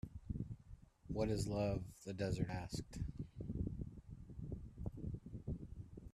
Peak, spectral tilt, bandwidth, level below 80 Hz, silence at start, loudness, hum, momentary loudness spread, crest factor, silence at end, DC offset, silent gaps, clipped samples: -24 dBFS; -7 dB/octave; 13.5 kHz; -54 dBFS; 0.05 s; -45 LUFS; none; 15 LU; 20 dB; 0.05 s; under 0.1%; none; under 0.1%